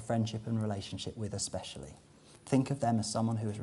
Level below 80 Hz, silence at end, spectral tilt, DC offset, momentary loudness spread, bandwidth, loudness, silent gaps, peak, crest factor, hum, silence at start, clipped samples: -62 dBFS; 0 s; -5.5 dB/octave; under 0.1%; 13 LU; 11.5 kHz; -34 LUFS; none; -14 dBFS; 20 dB; none; 0 s; under 0.1%